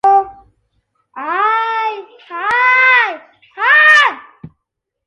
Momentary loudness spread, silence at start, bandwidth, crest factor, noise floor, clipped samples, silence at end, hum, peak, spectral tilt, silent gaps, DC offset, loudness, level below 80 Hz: 22 LU; 0.05 s; 11 kHz; 14 dB; -76 dBFS; under 0.1%; 0.6 s; none; 0 dBFS; -1.5 dB/octave; none; under 0.1%; -11 LUFS; -60 dBFS